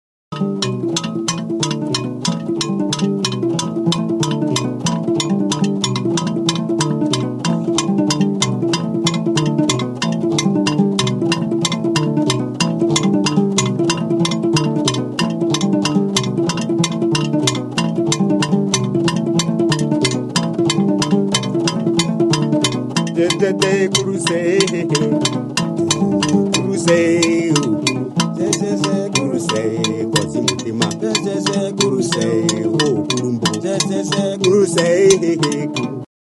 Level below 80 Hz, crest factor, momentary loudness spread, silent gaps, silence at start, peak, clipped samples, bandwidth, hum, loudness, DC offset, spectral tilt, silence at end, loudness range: -54 dBFS; 16 dB; 5 LU; none; 0.3 s; 0 dBFS; under 0.1%; 12 kHz; none; -17 LUFS; under 0.1%; -4.5 dB/octave; 0.3 s; 2 LU